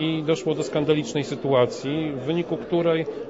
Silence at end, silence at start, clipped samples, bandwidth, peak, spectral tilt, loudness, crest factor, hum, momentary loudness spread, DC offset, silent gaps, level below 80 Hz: 0 s; 0 s; under 0.1%; 8 kHz; -8 dBFS; -6 dB/octave; -24 LUFS; 16 dB; none; 6 LU; under 0.1%; none; -60 dBFS